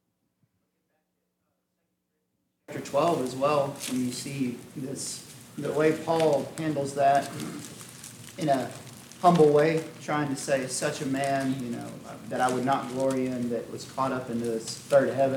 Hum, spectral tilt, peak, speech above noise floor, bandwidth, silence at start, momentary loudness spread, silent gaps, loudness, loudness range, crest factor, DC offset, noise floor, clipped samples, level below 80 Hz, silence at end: none; -5 dB/octave; -8 dBFS; 52 dB; 18 kHz; 2.7 s; 16 LU; none; -27 LUFS; 5 LU; 20 dB; under 0.1%; -78 dBFS; under 0.1%; -70 dBFS; 0 s